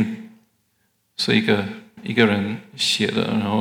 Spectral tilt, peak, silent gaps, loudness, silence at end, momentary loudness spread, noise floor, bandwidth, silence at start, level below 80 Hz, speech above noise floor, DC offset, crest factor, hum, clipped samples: -4.5 dB/octave; -2 dBFS; none; -20 LUFS; 0 s; 15 LU; -67 dBFS; 16.5 kHz; 0 s; -70 dBFS; 47 dB; under 0.1%; 20 dB; none; under 0.1%